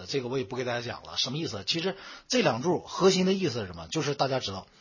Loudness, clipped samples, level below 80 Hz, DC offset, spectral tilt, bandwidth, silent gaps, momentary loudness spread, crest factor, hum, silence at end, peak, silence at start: -28 LUFS; under 0.1%; -60 dBFS; under 0.1%; -4.5 dB/octave; 7.4 kHz; none; 9 LU; 20 dB; none; 0.15 s; -10 dBFS; 0 s